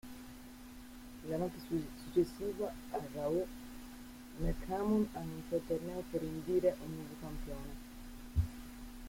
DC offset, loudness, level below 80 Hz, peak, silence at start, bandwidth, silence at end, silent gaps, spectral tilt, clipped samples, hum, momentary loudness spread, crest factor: under 0.1%; -39 LUFS; -50 dBFS; -20 dBFS; 0.05 s; 16.5 kHz; 0 s; none; -7 dB/octave; under 0.1%; none; 18 LU; 18 dB